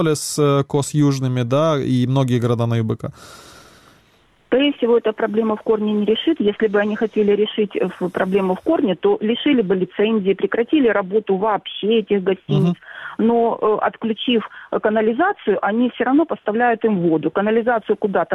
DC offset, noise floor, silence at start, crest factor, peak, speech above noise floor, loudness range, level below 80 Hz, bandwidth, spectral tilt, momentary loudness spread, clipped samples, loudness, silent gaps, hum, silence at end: under 0.1%; -56 dBFS; 0 s; 16 dB; -2 dBFS; 38 dB; 3 LU; -58 dBFS; 14 kHz; -6 dB/octave; 4 LU; under 0.1%; -18 LUFS; none; none; 0 s